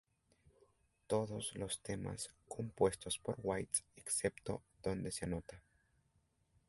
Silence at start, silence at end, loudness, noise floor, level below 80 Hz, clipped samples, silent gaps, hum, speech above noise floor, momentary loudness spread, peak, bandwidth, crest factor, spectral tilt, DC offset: 1.1 s; 1.1 s; -41 LUFS; -78 dBFS; -64 dBFS; under 0.1%; none; none; 37 dB; 10 LU; -20 dBFS; 12 kHz; 24 dB; -4 dB/octave; under 0.1%